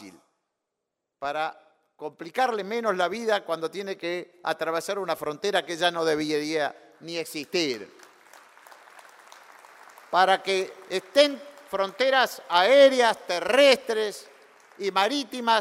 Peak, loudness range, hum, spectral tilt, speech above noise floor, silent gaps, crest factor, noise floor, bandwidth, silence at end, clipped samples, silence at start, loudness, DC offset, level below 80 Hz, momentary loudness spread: -4 dBFS; 9 LU; none; -3 dB/octave; 59 dB; none; 22 dB; -83 dBFS; 16 kHz; 0 s; under 0.1%; 0 s; -25 LUFS; under 0.1%; -74 dBFS; 14 LU